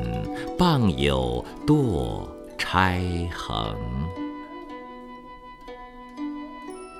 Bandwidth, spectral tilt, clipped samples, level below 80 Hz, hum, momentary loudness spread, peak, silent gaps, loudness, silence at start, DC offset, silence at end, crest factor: 15 kHz; -6.5 dB/octave; under 0.1%; -40 dBFS; none; 20 LU; -4 dBFS; none; -25 LUFS; 0 s; under 0.1%; 0 s; 22 dB